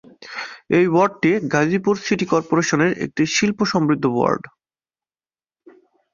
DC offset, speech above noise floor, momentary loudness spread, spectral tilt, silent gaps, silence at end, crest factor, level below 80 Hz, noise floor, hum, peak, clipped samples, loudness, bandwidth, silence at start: under 0.1%; over 72 dB; 8 LU; -5 dB/octave; none; 1.65 s; 18 dB; -58 dBFS; under -90 dBFS; none; -2 dBFS; under 0.1%; -19 LUFS; 7.4 kHz; 0.2 s